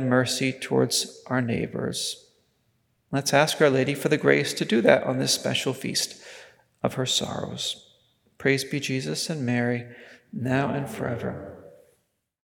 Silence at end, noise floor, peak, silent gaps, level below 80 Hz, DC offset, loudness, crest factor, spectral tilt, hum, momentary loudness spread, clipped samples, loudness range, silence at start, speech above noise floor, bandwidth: 0.9 s; -71 dBFS; -2 dBFS; none; -66 dBFS; under 0.1%; -25 LUFS; 24 dB; -4 dB/octave; none; 11 LU; under 0.1%; 6 LU; 0 s; 46 dB; 19 kHz